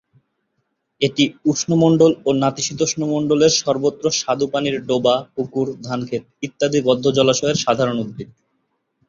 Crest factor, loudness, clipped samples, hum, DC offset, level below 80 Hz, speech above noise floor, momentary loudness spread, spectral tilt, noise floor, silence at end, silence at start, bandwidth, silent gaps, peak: 18 dB; -18 LUFS; under 0.1%; none; under 0.1%; -56 dBFS; 54 dB; 11 LU; -4.5 dB/octave; -72 dBFS; 0.85 s; 1 s; 7.6 kHz; none; -2 dBFS